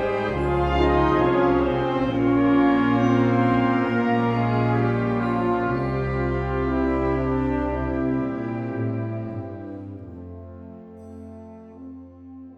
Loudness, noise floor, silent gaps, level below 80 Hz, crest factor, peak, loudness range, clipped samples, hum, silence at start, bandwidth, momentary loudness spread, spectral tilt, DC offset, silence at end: -22 LUFS; -42 dBFS; none; -36 dBFS; 16 dB; -8 dBFS; 13 LU; under 0.1%; none; 0 s; 6.8 kHz; 22 LU; -9 dB/octave; under 0.1%; 0 s